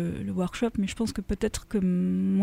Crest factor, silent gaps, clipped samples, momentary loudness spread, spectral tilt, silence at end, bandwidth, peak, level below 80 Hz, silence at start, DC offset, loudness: 14 dB; none; under 0.1%; 5 LU; -6.5 dB/octave; 0 s; 13.5 kHz; -14 dBFS; -44 dBFS; 0 s; under 0.1%; -28 LUFS